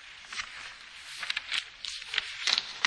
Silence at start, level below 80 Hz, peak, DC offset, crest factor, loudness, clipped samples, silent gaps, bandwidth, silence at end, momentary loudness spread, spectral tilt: 0 s; -68 dBFS; -4 dBFS; under 0.1%; 30 dB; -32 LUFS; under 0.1%; none; 11 kHz; 0 s; 15 LU; 2 dB/octave